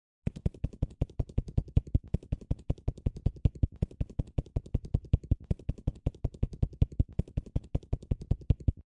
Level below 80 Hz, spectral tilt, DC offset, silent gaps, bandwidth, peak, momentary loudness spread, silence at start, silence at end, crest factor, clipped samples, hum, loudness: -36 dBFS; -10 dB/octave; under 0.1%; none; 8 kHz; -12 dBFS; 5 LU; 0.25 s; 0.25 s; 20 dB; under 0.1%; none; -34 LUFS